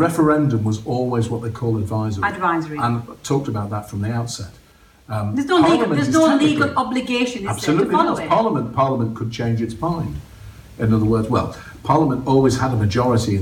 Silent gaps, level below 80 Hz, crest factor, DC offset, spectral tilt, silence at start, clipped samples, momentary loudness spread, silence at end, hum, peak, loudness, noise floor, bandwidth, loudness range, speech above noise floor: none; -44 dBFS; 18 dB; under 0.1%; -6.5 dB/octave; 0 s; under 0.1%; 10 LU; 0 s; none; -2 dBFS; -19 LUFS; -39 dBFS; 16 kHz; 5 LU; 21 dB